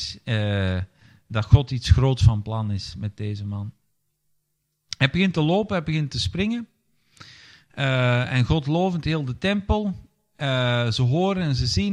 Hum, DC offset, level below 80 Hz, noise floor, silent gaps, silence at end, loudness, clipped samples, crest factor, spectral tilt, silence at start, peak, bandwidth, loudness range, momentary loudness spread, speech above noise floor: none; under 0.1%; -36 dBFS; -74 dBFS; none; 0 s; -23 LUFS; under 0.1%; 22 dB; -6.5 dB/octave; 0 s; -2 dBFS; 10 kHz; 3 LU; 12 LU; 53 dB